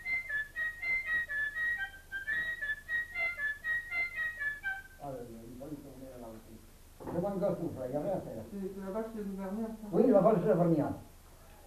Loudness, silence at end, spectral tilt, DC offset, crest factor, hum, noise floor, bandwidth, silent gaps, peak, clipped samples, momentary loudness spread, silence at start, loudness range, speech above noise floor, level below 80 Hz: -33 LUFS; 0 s; -7 dB/octave; under 0.1%; 22 dB; none; -55 dBFS; 14 kHz; none; -14 dBFS; under 0.1%; 18 LU; 0 s; 8 LU; 24 dB; -58 dBFS